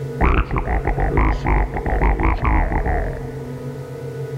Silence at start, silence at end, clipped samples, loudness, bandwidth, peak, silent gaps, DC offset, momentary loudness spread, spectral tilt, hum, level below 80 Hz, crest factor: 0 s; 0 s; under 0.1%; -21 LUFS; 6.8 kHz; -4 dBFS; none; under 0.1%; 11 LU; -8 dB/octave; none; -22 dBFS; 16 dB